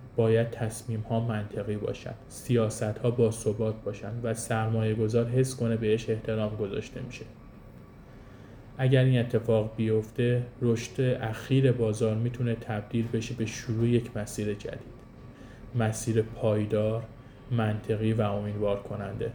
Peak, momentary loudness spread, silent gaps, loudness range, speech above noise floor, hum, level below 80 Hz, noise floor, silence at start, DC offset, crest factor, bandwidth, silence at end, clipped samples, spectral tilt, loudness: -10 dBFS; 15 LU; none; 4 LU; 21 dB; none; -52 dBFS; -48 dBFS; 0 s; under 0.1%; 18 dB; 20 kHz; 0 s; under 0.1%; -7 dB/octave; -29 LUFS